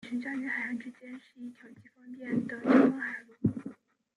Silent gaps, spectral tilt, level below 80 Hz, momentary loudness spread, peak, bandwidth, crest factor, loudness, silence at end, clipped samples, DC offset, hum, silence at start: none; -8 dB/octave; -72 dBFS; 24 LU; -10 dBFS; 9.4 kHz; 22 dB; -30 LUFS; 0.45 s; under 0.1%; under 0.1%; none; 0.05 s